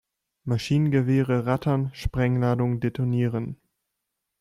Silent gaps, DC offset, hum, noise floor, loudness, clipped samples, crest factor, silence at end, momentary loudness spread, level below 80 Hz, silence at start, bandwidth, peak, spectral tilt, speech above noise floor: none; under 0.1%; none; -82 dBFS; -25 LUFS; under 0.1%; 16 dB; 0.85 s; 9 LU; -44 dBFS; 0.45 s; 12 kHz; -10 dBFS; -8 dB/octave; 58 dB